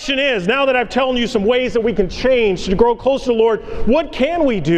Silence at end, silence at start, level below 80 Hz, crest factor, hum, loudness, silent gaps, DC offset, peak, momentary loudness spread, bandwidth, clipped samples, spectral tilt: 0 s; 0 s; -32 dBFS; 16 dB; none; -16 LUFS; none; under 0.1%; 0 dBFS; 3 LU; 9.4 kHz; under 0.1%; -5.5 dB/octave